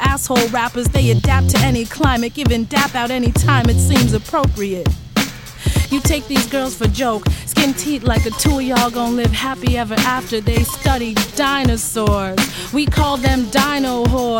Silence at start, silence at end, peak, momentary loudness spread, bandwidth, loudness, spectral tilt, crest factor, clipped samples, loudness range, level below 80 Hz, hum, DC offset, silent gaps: 0 s; 0 s; 0 dBFS; 5 LU; 17 kHz; -16 LUFS; -5 dB/octave; 16 dB; under 0.1%; 2 LU; -24 dBFS; none; under 0.1%; none